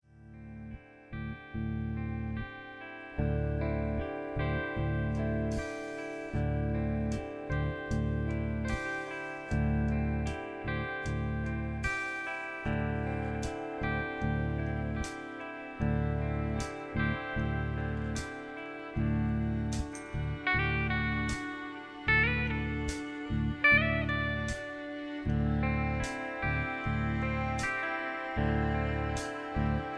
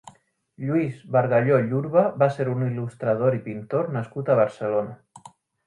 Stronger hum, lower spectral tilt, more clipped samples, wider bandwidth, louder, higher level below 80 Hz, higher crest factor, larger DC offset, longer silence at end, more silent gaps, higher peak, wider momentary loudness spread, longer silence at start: neither; second, -6.5 dB/octave vs -9 dB/octave; neither; about the same, 11 kHz vs 10.5 kHz; second, -33 LUFS vs -23 LUFS; first, -40 dBFS vs -66 dBFS; about the same, 20 dB vs 18 dB; neither; second, 0 s vs 0.4 s; neither; second, -12 dBFS vs -6 dBFS; about the same, 9 LU vs 8 LU; about the same, 0.15 s vs 0.05 s